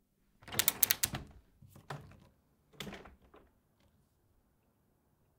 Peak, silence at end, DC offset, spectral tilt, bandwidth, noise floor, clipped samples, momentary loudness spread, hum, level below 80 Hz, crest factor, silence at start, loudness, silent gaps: -2 dBFS; 2.3 s; under 0.1%; -1 dB/octave; 16.5 kHz; -74 dBFS; under 0.1%; 21 LU; none; -64 dBFS; 38 dB; 0.45 s; -31 LUFS; none